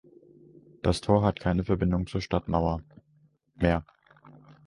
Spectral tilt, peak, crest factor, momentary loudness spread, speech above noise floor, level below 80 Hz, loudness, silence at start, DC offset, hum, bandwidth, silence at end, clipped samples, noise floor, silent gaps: -7.5 dB/octave; -8 dBFS; 22 dB; 7 LU; 39 dB; -42 dBFS; -28 LUFS; 0.85 s; under 0.1%; none; 11.5 kHz; 0.85 s; under 0.1%; -65 dBFS; none